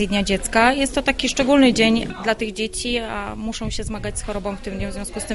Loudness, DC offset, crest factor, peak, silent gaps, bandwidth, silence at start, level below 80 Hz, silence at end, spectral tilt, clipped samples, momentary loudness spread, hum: -20 LUFS; under 0.1%; 18 dB; -2 dBFS; none; 11.5 kHz; 0 s; -36 dBFS; 0 s; -3.5 dB/octave; under 0.1%; 13 LU; none